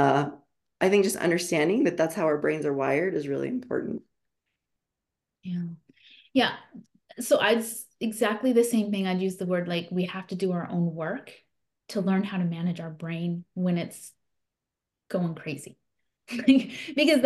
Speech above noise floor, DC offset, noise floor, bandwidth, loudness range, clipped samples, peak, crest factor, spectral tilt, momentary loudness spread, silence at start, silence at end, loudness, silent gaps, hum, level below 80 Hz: 61 dB; under 0.1%; -87 dBFS; 12.5 kHz; 8 LU; under 0.1%; -8 dBFS; 20 dB; -5.5 dB/octave; 14 LU; 0 s; 0 s; -27 LUFS; none; none; -72 dBFS